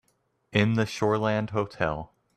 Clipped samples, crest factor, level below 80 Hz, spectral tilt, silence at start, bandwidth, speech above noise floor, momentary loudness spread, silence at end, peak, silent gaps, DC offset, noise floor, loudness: under 0.1%; 20 dB; -54 dBFS; -6.5 dB/octave; 0.55 s; 12.5 kHz; 46 dB; 6 LU; 0.3 s; -8 dBFS; none; under 0.1%; -72 dBFS; -27 LUFS